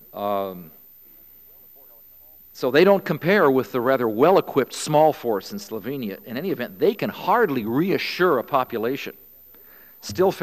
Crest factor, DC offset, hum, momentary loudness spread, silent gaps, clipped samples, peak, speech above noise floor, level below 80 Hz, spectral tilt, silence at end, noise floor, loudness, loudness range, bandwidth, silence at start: 18 dB; 0.1%; none; 13 LU; none; under 0.1%; -4 dBFS; 28 dB; -66 dBFS; -5.5 dB/octave; 0 s; -49 dBFS; -22 LUFS; 4 LU; 15 kHz; 0.15 s